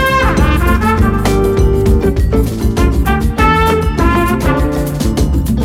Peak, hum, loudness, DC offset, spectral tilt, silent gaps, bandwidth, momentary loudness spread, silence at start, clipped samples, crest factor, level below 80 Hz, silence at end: 0 dBFS; none; -13 LUFS; under 0.1%; -6.5 dB/octave; none; 16.5 kHz; 3 LU; 0 s; under 0.1%; 10 dB; -16 dBFS; 0 s